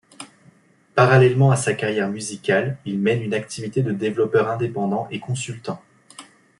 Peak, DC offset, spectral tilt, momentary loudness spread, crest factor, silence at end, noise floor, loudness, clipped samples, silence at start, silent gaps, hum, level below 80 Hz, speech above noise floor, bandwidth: -2 dBFS; under 0.1%; -6 dB/octave; 16 LU; 20 dB; 0.35 s; -55 dBFS; -21 LUFS; under 0.1%; 0.2 s; none; none; -60 dBFS; 35 dB; 11.5 kHz